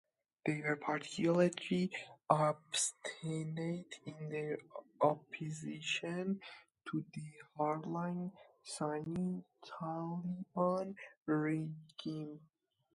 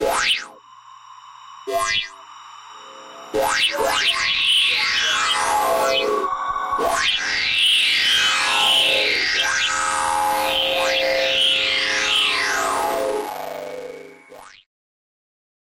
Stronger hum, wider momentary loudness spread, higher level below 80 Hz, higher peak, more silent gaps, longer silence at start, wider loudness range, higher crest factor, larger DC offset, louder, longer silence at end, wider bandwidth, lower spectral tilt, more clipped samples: second, none vs 60 Hz at -70 dBFS; about the same, 14 LU vs 14 LU; second, -80 dBFS vs -52 dBFS; second, -14 dBFS vs -8 dBFS; first, 11.17-11.26 s vs none; first, 0.45 s vs 0 s; about the same, 6 LU vs 8 LU; first, 26 dB vs 14 dB; neither; second, -39 LUFS vs -18 LUFS; second, 0.5 s vs 1.15 s; second, 11.5 kHz vs 16.5 kHz; first, -5 dB/octave vs 0 dB/octave; neither